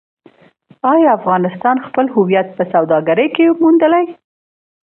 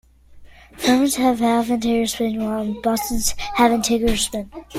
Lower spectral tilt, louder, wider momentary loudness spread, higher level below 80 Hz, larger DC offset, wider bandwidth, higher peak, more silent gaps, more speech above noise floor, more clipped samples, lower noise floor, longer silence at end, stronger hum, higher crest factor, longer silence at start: first, -10.5 dB/octave vs -3.5 dB/octave; first, -13 LUFS vs -20 LUFS; about the same, 5 LU vs 6 LU; second, -64 dBFS vs -36 dBFS; neither; second, 3.6 kHz vs 16.5 kHz; about the same, 0 dBFS vs -2 dBFS; neither; first, 35 dB vs 25 dB; neither; first, -48 dBFS vs -44 dBFS; first, 0.8 s vs 0 s; neither; about the same, 14 dB vs 18 dB; first, 0.85 s vs 0.35 s